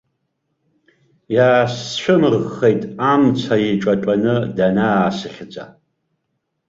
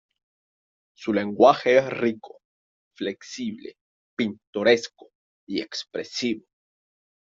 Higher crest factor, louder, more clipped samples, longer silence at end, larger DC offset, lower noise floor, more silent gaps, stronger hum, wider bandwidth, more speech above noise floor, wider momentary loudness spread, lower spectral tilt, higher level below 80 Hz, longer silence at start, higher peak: second, 16 dB vs 24 dB; first, -17 LUFS vs -24 LUFS; neither; about the same, 1 s vs 0.9 s; neither; second, -73 dBFS vs under -90 dBFS; second, none vs 2.45-2.91 s, 3.81-4.17 s, 4.47-4.53 s, 5.15-5.47 s; neither; about the same, 7.8 kHz vs 7.6 kHz; second, 57 dB vs over 66 dB; second, 11 LU vs 18 LU; first, -6.5 dB/octave vs -4.5 dB/octave; first, -54 dBFS vs -68 dBFS; first, 1.3 s vs 1 s; about the same, -2 dBFS vs -2 dBFS